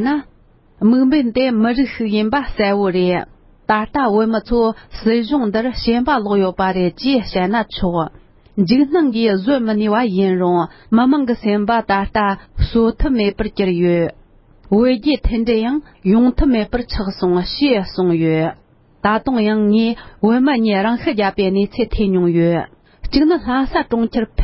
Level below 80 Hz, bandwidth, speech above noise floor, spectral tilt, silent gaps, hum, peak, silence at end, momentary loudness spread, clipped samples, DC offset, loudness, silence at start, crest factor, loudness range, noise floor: -32 dBFS; 5.8 kHz; 30 dB; -11 dB/octave; none; none; 0 dBFS; 0 s; 6 LU; under 0.1%; under 0.1%; -16 LUFS; 0 s; 16 dB; 2 LU; -45 dBFS